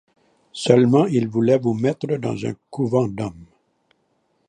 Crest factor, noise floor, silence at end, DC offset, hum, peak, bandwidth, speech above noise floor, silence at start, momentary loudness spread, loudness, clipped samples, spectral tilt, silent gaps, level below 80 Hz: 20 dB; -67 dBFS; 1.05 s; under 0.1%; none; 0 dBFS; 10.5 kHz; 48 dB; 0.55 s; 14 LU; -20 LUFS; under 0.1%; -7 dB/octave; none; -58 dBFS